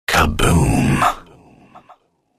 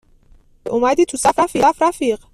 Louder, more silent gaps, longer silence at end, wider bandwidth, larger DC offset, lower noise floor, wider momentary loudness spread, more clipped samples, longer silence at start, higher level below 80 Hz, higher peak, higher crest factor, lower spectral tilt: about the same, -16 LUFS vs -16 LUFS; neither; first, 0.6 s vs 0.2 s; first, 15.5 kHz vs 14 kHz; neither; about the same, -51 dBFS vs -49 dBFS; second, 4 LU vs 7 LU; neither; second, 0.1 s vs 0.65 s; first, -28 dBFS vs -48 dBFS; about the same, -2 dBFS vs -2 dBFS; about the same, 16 dB vs 14 dB; first, -5 dB/octave vs -3.5 dB/octave